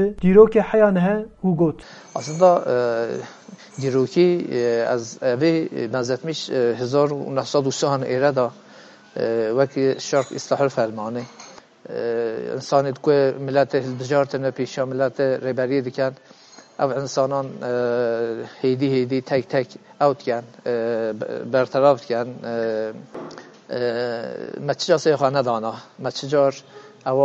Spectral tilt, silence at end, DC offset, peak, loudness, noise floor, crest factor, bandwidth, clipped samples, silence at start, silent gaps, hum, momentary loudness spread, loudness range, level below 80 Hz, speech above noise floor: -6 dB/octave; 0 s; under 0.1%; -2 dBFS; -21 LUFS; -46 dBFS; 20 dB; 8.2 kHz; under 0.1%; 0 s; none; none; 12 LU; 3 LU; -56 dBFS; 25 dB